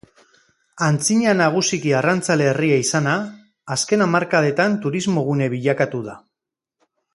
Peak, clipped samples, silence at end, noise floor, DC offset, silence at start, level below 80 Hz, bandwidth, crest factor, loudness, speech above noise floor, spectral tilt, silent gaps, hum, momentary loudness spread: -2 dBFS; under 0.1%; 0.95 s; -84 dBFS; under 0.1%; 0.75 s; -62 dBFS; 11.5 kHz; 18 dB; -19 LUFS; 66 dB; -4.5 dB/octave; none; none; 7 LU